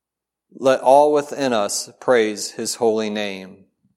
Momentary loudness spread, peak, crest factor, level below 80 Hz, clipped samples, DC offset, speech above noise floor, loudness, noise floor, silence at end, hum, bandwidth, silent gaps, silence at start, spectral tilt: 12 LU; -2 dBFS; 18 dB; -70 dBFS; under 0.1%; under 0.1%; 63 dB; -19 LUFS; -82 dBFS; 0.45 s; none; 15 kHz; none; 0.55 s; -3 dB/octave